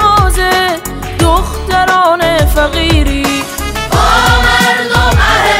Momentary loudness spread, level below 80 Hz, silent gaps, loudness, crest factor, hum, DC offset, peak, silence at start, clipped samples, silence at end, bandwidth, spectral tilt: 7 LU; -16 dBFS; none; -10 LUFS; 10 dB; none; under 0.1%; 0 dBFS; 0 s; under 0.1%; 0 s; 16.5 kHz; -4 dB/octave